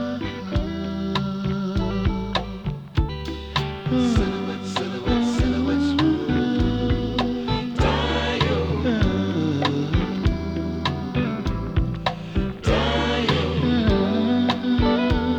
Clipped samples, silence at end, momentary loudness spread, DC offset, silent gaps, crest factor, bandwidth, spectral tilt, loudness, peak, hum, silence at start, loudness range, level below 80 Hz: under 0.1%; 0 s; 7 LU; under 0.1%; none; 16 dB; 9.2 kHz; -6.5 dB/octave; -23 LUFS; -6 dBFS; none; 0 s; 3 LU; -32 dBFS